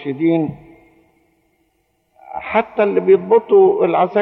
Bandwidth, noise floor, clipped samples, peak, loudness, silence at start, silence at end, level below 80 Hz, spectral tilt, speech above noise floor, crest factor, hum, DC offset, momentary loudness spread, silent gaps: 4.1 kHz; -64 dBFS; under 0.1%; -2 dBFS; -15 LUFS; 0 s; 0 s; -60 dBFS; -10 dB/octave; 50 dB; 14 dB; none; under 0.1%; 12 LU; none